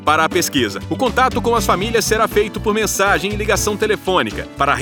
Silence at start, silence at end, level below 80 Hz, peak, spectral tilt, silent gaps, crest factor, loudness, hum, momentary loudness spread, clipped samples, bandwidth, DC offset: 0 s; 0 s; -34 dBFS; 0 dBFS; -3.5 dB/octave; none; 16 dB; -17 LUFS; none; 4 LU; under 0.1%; over 20 kHz; under 0.1%